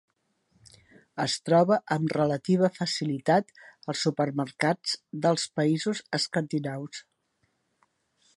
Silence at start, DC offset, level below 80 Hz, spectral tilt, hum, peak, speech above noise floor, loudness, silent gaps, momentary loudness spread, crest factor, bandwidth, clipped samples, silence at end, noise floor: 1.15 s; under 0.1%; -72 dBFS; -5 dB/octave; none; -10 dBFS; 47 dB; -27 LUFS; none; 11 LU; 20 dB; 11.5 kHz; under 0.1%; 1.35 s; -74 dBFS